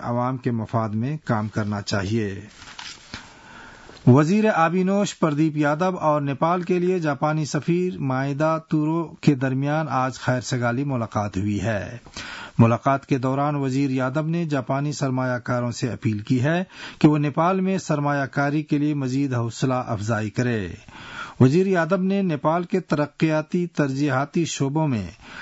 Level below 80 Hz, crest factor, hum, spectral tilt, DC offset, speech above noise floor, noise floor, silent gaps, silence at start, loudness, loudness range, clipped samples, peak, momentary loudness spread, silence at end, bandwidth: -58 dBFS; 16 dB; none; -7 dB/octave; under 0.1%; 22 dB; -44 dBFS; none; 0 s; -22 LUFS; 3 LU; under 0.1%; -6 dBFS; 10 LU; 0 s; 8 kHz